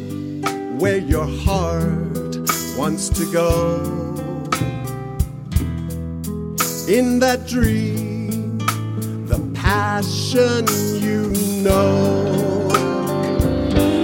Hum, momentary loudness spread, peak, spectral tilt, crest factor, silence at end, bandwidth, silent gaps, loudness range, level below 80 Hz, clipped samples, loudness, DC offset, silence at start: none; 9 LU; 0 dBFS; -5.5 dB/octave; 18 dB; 0 s; 17 kHz; none; 4 LU; -30 dBFS; under 0.1%; -20 LUFS; under 0.1%; 0 s